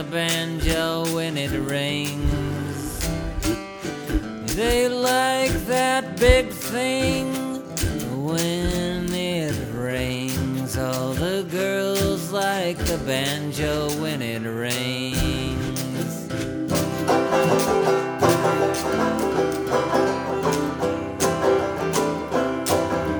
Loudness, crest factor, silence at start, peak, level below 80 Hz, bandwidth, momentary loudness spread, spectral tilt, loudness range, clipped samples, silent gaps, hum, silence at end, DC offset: -23 LUFS; 22 dB; 0 s; 0 dBFS; -36 dBFS; over 20 kHz; 7 LU; -4.5 dB/octave; 4 LU; under 0.1%; none; none; 0 s; under 0.1%